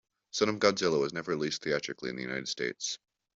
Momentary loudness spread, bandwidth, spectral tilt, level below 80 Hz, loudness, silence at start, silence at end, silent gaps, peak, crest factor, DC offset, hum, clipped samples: 11 LU; 7.8 kHz; -3.5 dB/octave; -70 dBFS; -31 LUFS; 0.35 s; 0.4 s; none; -10 dBFS; 22 dB; under 0.1%; none; under 0.1%